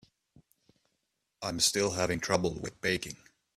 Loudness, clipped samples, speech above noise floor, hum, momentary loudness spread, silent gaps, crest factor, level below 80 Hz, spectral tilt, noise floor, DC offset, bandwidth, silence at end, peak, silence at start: -30 LUFS; under 0.1%; 50 dB; none; 13 LU; none; 22 dB; -58 dBFS; -3 dB/octave; -81 dBFS; under 0.1%; 15.5 kHz; 0.4 s; -12 dBFS; 1.4 s